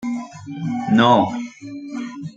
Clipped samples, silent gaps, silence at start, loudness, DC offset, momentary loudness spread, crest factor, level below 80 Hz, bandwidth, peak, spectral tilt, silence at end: under 0.1%; none; 0 s; -19 LUFS; under 0.1%; 19 LU; 18 dB; -62 dBFS; 7.8 kHz; -2 dBFS; -6.5 dB/octave; 0.05 s